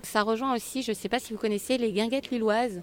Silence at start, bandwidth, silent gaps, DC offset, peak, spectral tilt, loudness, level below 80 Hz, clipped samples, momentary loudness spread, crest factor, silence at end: 0.05 s; 17.5 kHz; none; under 0.1%; -10 dBFS; -4 dB/octave; -28 LUFS; -60 dBFS; under 0.1%; 4 LU; 18 dB; 0 s